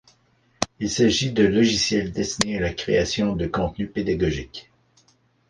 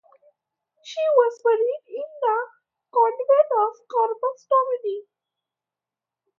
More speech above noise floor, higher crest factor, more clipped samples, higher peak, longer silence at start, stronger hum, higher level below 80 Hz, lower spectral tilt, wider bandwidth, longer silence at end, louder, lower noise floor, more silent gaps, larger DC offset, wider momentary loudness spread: second, 40 dB vs 67 dB; about the same, 22 dB vs 18 dB; neither; about the same, -2 dBFS vs -4 dBFS; second, 0.6 s vs 0.85 s; neither; first, -42 dBFS vs under -90 dBFS; first, -4.5 dB/octave vs -1.5 dB/octave; first, 11 kHz vs 7.2 kHz; second, 0.9 s vs 1.4 s; about the same, -22 LUFS vs -22 LUFS; second, -62 dBFS vs -89 dBFS; neither; neither; second, 10 LU vs 13 LU